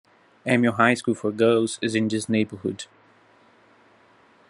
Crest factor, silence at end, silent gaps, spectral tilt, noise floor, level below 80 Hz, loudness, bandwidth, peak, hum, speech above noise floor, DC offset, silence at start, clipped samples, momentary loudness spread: 22 dB; 1.65 s; none; -5 dB/octave; -57 dBFS; -70 dBFS; -23 LUFS; 11.5 kHz; -2 dBFS; none; 34 dB; under 0.1%; 0.45 s; under 0.1%; 13 LU